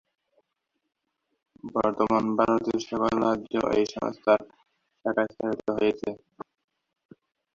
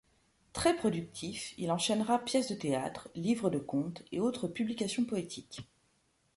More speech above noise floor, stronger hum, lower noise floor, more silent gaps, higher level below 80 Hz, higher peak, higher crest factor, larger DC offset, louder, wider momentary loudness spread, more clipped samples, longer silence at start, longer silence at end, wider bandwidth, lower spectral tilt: first, 55 dB vs 40 dB; neither; first, -80 dBFS vs -73 dBFS; neither; about the same, -60 dBFS vs -64 dBFS; first, -8 dBFS vs -14 dBFS; about the same, 20 dB vs 20 dB; neither; first, -26 LUFS vs -34 LUFS; about the same, 13 LU vs 11 LU; neither; first, 1.65 s vs 0.55 s; first, 1.35 s vs 0.75 s; second, 7.6 kHz vs 11.5 kHz; first, -6 dB/octave vs -4.5 dB/octave